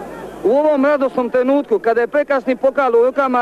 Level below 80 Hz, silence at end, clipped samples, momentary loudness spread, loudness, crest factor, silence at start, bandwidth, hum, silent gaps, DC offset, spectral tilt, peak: -54 dBFS; 0 s; under 0.1%; 3 LU; -16 LUFS; 10 dB; 0 s; 13 kHz; none; none; under 0.1%; -6 dB/octave; -6 dBFS